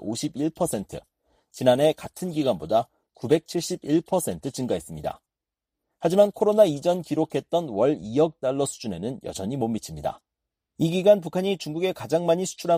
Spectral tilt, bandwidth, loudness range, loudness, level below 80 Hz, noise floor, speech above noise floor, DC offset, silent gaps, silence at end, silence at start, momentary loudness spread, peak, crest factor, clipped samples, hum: -5.5 dB/octave; 15.5 kHz; 4 LU; -25 LUFS; -58 dBFS; -88 dBFS; 64 dB; under 0.1%; none; 0 s; 0 s; 13 LU; -6 dBFS; 18 dB; under 0.1%; none